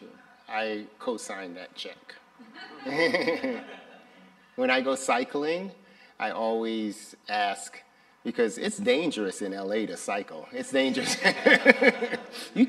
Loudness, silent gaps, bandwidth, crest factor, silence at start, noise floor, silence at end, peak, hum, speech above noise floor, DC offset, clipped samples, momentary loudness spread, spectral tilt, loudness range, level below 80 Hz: -27 LUFS; none; 13.5 kHz; 28 dB; 0 s; -55 dBFS; 0 s; 0 dBFS; none; 28 dB; under 0.1%; under 0.1%; 18 LU; -3.5 dB/octave; 8 LU; -78 dBFS